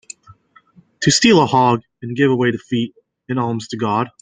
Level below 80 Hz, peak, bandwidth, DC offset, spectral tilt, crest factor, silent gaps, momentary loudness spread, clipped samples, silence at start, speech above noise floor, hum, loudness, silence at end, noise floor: -54 dBFS; -2 dBFS; 9.6 kHz; under 0.1%; -4.5 dB/octave; 16 dB; none; 15 LU; under 0.1%; 1 s; 35 dB; none; -17 LUFS; 0.15 s; -51 dBFS